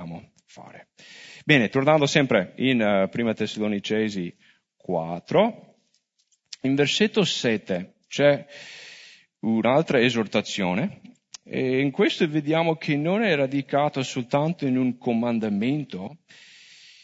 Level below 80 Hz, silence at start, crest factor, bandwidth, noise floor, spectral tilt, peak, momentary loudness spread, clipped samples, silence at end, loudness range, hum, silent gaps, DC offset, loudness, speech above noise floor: -68 dBFS; 0 s; 20 dB; 8 kHz; -70 dBFS; -5.5 dB/octave; -4 dBFS; 17 LU; under 0.1%; 0.9 s; 4 LU; none; none; under 0.1%; -23 LUFS; 47 dB